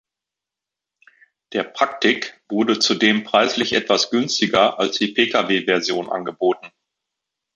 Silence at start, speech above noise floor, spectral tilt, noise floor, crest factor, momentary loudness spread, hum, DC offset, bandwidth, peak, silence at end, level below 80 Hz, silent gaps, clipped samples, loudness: 1.5 s; 67 dB; -3 dB/octave; -86 dBFS; 18 dB; 9 LU; none; under 0.1%; 8.8 kHz; -2 dBFS; 0.9 s; -64 dBFS; none; under 0.1%; -19 LUFS